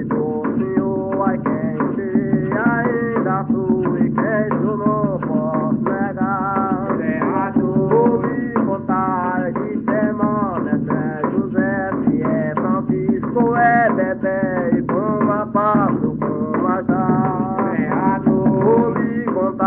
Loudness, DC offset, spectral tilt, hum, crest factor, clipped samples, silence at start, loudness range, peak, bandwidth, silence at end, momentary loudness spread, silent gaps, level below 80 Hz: -18 LUFS; under 0.1%; -9.5 dB/octave; none; 14 dB; under 0.1%; 0 s; 2 LU; -4 dBFS; 3.1 kHz; 0 s; 5 LU; none; -48 dBFS